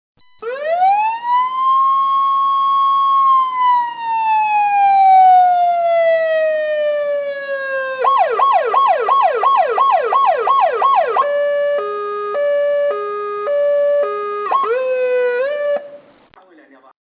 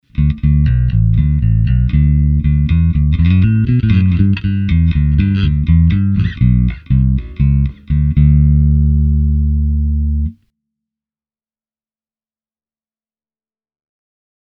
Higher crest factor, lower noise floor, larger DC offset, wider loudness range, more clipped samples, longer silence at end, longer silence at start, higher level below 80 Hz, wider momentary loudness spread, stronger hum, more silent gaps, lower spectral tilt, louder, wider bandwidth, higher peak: about the same, 12 dB vs 12 dB; second, -47 dBFS vs under -90 dBFS; neither; about the same, 5 LU vs 7 LU; neither; second, 1.05 s vs 4.2 s; first, 0.4 s vs 0.15 s; second, -70 dBFS vs -18 dBFS; first, 8 LU vs 5 LU; neither; neither; second, -5 dB/octave vs -10.5 dB/octave; about the same, -15 LUFS vs -13 LUFS; about the same, 5 kHz vs 4.8 kHz; second, -4 dBFS vs 0 dBFS